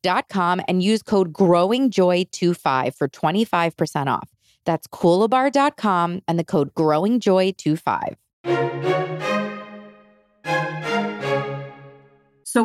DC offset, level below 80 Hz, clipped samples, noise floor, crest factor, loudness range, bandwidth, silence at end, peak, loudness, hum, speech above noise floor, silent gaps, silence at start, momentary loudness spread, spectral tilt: under 0.1%; -66 dBFS; under 0.1%; -54 dBFS; 16 dB; 6 LU; 15 kHz; 0 s; -6 dBFS; -21 LUFS; none; 34 dB; 8.33-8.44 s; 0.05 s; 9 LU; -6 dB/octave